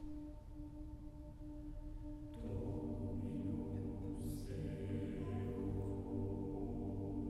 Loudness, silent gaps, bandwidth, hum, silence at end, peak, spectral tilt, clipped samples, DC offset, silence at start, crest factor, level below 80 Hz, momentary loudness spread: -46 LUFS; none; 13.5 kHz; none; 0 s; -32 dBFS; -9 dB/octave; under 0.1%; under 0.1%; 0 s; 12 dB; -52 dBFS; 10 LU